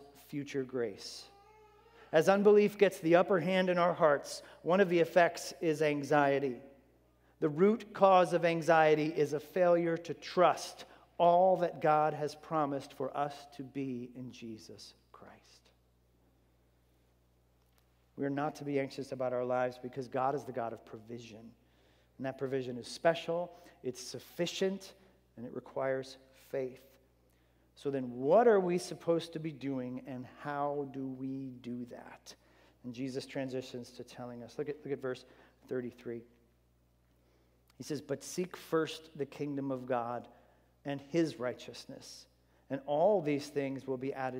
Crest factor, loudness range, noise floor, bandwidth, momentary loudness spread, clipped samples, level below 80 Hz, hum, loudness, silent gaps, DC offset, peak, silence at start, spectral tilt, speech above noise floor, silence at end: 22 dB; 14 LU; -70 dBFS; 16 kHz; 20 LU; under 0.1%; -74 dBFS; 60 Hz at -65 dBFS; -33 LUFS; none; under 0.1%; -12 dBFS; 0 s; -5.5 dB/octave; 37 dB; 0 s